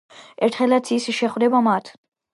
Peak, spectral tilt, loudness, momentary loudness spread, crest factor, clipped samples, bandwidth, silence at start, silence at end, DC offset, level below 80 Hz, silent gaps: -6 dBFS; -4.5 dB/octave; -20 LUFS; 5 LU; 16 dB; under 0.1%; 11.5 kHz; 0.15 s; 0.45 s; under 0.1%; -76 dBFS; none